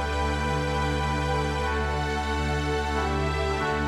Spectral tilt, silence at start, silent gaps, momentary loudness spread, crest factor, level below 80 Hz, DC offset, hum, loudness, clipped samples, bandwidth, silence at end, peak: -5.5 dB/octave; 0 s; none; 1 LU; 12 dB; -32 dBFS; under 0.1%; none; -27 LUFS; under 0.1%; 12.5 kHz; 0 s; -14 dBFS